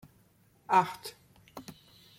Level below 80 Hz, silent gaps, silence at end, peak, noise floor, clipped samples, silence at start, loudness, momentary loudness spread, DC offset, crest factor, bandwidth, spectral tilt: -72 dBFS; none; 0.45 s; -12 dBFS; -65 dBFS; under 0.1%; 0.7 s; -28 LUFS; 24 LU; under 0.1%; 22 dB; 16.5 kHz; -4.5 dB/octave